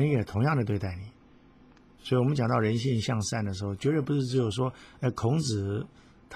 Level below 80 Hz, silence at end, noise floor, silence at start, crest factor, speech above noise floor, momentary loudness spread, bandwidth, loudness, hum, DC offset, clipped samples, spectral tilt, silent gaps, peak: -50 dBFS; 0 s; -56 dBFS; 0 s; 16 dB; 29 dB; 9 LU; 12 kHz; -29 LUFS; none; under 0.1%; under 0.1%; -6.5 dB/octave; none; -12 dBFS